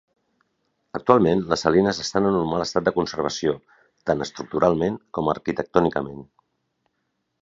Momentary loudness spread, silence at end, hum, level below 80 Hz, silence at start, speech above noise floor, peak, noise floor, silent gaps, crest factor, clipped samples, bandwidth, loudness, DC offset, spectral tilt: 11 LU; 1.2 s; none; -52 dBFS; 0.95 s; 53 dB; 0 dBFS; -75 dBFS; none; 24 dB; under 0.1%; 7.8 kHz; -22 LUFS; under 0.1%; -5.5 dB/octave